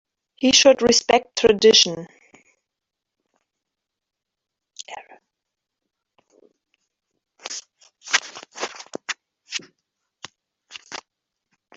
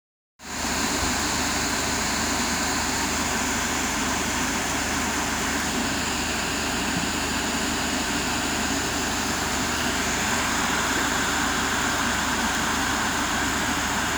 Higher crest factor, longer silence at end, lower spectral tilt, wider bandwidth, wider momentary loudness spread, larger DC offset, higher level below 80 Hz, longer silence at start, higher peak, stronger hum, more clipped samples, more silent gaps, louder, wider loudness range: first, 24 dB vs 14 dB; first, 0.8 s vs 0 s; about the same, -1.5 dB/octave vs -2 dB/octave; second, 8 kHz vs over 20 kHz; first, 24 LU vs 2 LU; neither; second, -60 dBFS vs -40 dBFS; about the same, 0.4 s vs 0.4 s; first, 0 dBFS vs -10 dBFS; neither; neither; neither; first, -18 LUFS vs -24 LUFS; first, 23 LU vs 1 LU